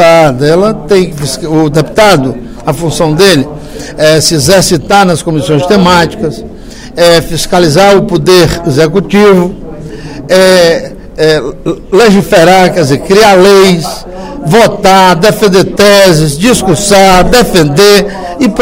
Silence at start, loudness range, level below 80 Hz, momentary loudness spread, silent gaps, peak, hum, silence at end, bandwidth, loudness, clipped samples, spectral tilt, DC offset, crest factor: 0 s; 3 LU; -26 dBFS; 13 LU; none; 0 dBFS; none; 0 s; over 20 kHz; -6 LUFS; 6%; -4.5 dB/octave; under 0.1%; 6 dB